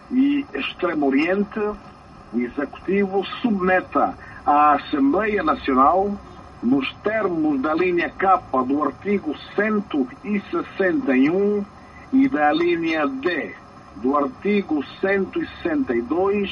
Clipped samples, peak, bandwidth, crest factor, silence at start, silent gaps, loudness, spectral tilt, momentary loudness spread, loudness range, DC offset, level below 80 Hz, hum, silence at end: under 0.1%; -4 dBFS; 6.6 kHz; 16 dB; 0.1 s; none; -21 LUFS; -7.5 dB/octave; 9 LU; 4 LU; under 0.1%; -50 dBFS; none; 0 s